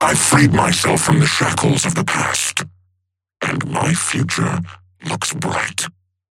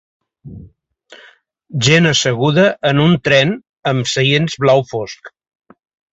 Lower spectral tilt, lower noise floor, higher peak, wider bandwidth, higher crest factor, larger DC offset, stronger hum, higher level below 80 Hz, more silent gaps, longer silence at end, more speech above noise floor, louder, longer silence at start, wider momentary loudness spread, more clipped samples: about the same, -4 dB/octave vs -5 dB/octave; first, -72 dBFS vs -48 dBFS; about the same, -2 dBFS vs 0 dBFS; first, 16.5 kHz vs 8 kHz; about the same, 16 dB vs 16 dB; neither; neither; about the same, -48 dBFS vs -50 dBFS; second, none vs 3.69-3.74 s; second, 0.45 s vs 0.85 s; first, 55 dB vs 34 dB; second, -17 LUFS vs -14 LUFS; second, 0 s vs 0.45 s; about the same, 13 LU vs 13 LU; neither